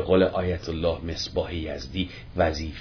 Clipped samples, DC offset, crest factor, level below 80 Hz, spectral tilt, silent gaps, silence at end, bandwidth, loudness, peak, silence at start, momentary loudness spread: under 0.1%; under 0.1%; 18 dB; -40 dBFS; -6 dB/octave; none; 0 s; 5.4 kHz; -27 LUFS; -8 dBFS; 0 s; 10 LU